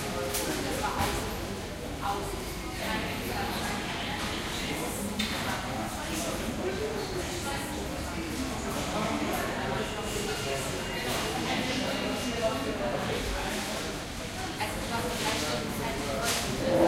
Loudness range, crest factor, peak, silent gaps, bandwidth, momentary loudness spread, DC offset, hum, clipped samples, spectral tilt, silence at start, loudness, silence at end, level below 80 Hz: 2 LU; 20 dB; -12 dBFS; none; 16 kHz; 5 LU; under 0.1%; none; under 0.1%; -3.5 dB/octave; 0 s; -31 LUFS; 0 s; -44 dBFS